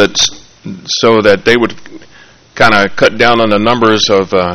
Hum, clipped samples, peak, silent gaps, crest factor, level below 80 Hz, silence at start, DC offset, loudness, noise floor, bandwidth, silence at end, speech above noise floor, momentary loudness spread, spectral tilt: none; 0.8%; 0 dBFS; none; 10 dB; -40 dBFS; 0 s; under 0.1%; -9 LUFS; -41 dBFS; 14 kHz; 0 s; 31 dB; 9 LU; -3.5 dB/octave